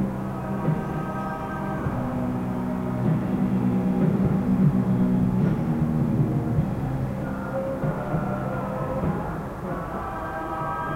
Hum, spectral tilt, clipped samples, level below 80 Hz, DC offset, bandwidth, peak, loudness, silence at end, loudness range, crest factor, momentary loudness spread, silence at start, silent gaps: none; -9.5 dB/octave; under 0.1%; -42 dBFS; under 0.1%; 15.5 kHz; -10 dBFS; -26 LUFS; 0 s; 6 LU; 14 dB; 8 LU; 0 s; none